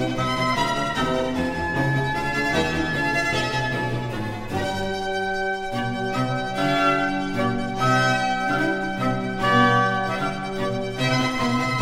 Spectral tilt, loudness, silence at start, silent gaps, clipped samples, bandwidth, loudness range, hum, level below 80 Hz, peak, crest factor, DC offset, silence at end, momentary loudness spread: -5 dB/octave; -23 LUFS; 0 s; none; under 0.1%; 16 kHz; 3 LU; none; -42 dBFS; -6 dBFS; 16 dB; 0.2%; 0 s; 7 LU